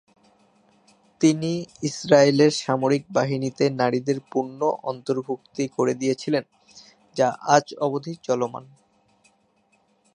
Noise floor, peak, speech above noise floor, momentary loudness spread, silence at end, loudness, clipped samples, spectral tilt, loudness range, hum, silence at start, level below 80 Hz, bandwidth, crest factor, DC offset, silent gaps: -65 dBFS; -2 dBFS; 42 dB; 11 LU; 1.5 s; -23 LUFS; under 0.1%; -5.5 dB/octave; 5 LU; none; 1.2 s; -70 dBFS; 10.5 kHz; 22 dB; under 0.1%; none